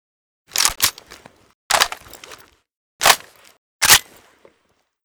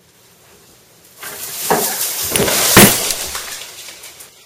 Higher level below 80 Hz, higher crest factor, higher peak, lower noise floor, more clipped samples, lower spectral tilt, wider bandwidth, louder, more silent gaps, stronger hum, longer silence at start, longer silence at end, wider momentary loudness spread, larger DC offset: second, -48 dBFS vs -42 dBFS; about the same, 22 dB vs 18 dB; about the same, 0 dBFS vs 0 dBFS; first, -66 dBFS vs -48 dBFS; second, under 0.1% vs 0.4%; second, 1 dB/octave vs -2.5 dB/octave; first, over 20 kHz vs 17 kHz; second, -16 LUFS vs -13 LUFS; first, 1.54-1.70 s, 2.75-2.99 s, 3.58-3.79 s vs none; neither; second, 0.55 s vs 1.2 s; first, 1.05 s vs 0.2 s; second, 19 LU vs 25 LU; neither